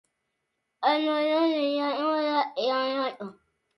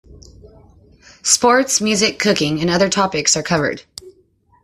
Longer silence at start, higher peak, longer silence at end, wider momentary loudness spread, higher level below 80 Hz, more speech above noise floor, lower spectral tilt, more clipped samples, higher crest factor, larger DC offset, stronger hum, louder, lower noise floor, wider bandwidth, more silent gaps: first, 0.8 s vs 0.1 s; second, -10 dBFS vs 0 dBFS; about the same, 0.45 s vs 0.55 s; second, 7 LU vs 11 LU; second, -82 dBFS vs -50 dBFS; first, 54 dB vs 40 dB; first, -5 dB/octave vs -2.5 dB/octave; neither; about the same, 18 dB vs 18 dB; neither; neither; second, -26 LUFS vs -15 LUFS; first, -80 dBFS vs -56 dBFS; second, 11.5 kHz vs 14 kHz; neither